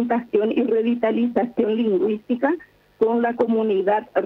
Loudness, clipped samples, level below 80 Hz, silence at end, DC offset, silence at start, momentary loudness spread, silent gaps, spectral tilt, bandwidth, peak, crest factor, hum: -21 LUFS; under 0.1%; -64 dBFS; 0 s; under 0.1%; 0 s; 3 LU; none; -8.5 dB/octave; 4.2 kHz; -8 dBFS; 14 dB; none